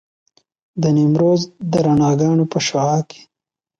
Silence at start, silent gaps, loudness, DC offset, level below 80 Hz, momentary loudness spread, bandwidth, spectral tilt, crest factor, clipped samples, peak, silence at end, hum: 0.75 s; none; -16 LUFS; under 0.1%; -54 dBFS; 7 LU; 7.8 kHz; -6.5 dB/octave; 12 dB; under 0.1%; -4 dBFS; 0.75 s; none